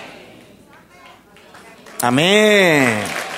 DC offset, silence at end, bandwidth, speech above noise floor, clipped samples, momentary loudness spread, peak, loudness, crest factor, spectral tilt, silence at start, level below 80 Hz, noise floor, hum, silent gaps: under 0.1%; 0 s; 16 kHz; 32 dB; under 0.1%; 18 LU; 0 dBFS; -14 LUFS; 18 dB; -4 dB/octave; 0 s; -60 dBFS; -46 dBFS; none; none